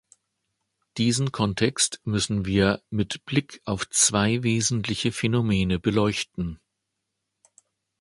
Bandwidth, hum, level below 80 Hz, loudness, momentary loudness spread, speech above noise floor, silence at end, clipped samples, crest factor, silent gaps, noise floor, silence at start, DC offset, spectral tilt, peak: 11.5 kHz; none; -48 dBFS; -24 LUFS; 9 LU; 57 dB; 1.45 s; under 0.1%; 20 dB; none; -81 dBFS; 0.95 s; under 0.1%; -4 dB/octave; -4 dBFS